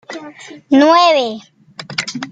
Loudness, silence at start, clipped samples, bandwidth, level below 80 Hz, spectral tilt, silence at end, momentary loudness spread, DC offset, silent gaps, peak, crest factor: -13 LUFS; 0.1 s; under 0.1%; 9.2 kHz; -64 dBFS; -3.5 dB/octave; 0.05 s; 23 LU; under 0.1%; none; -2 dBFS; 14 dB